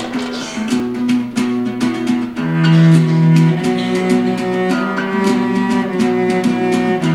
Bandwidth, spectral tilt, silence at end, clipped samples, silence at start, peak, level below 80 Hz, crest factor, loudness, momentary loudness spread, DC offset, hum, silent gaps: 12 kHz; -7 dB/octave; 0 s; under 0.1%; 0 s; 0 dBFS; -54 dBFS; 14 dB; -15 LUFS; 8 LU; 0.2%; none; none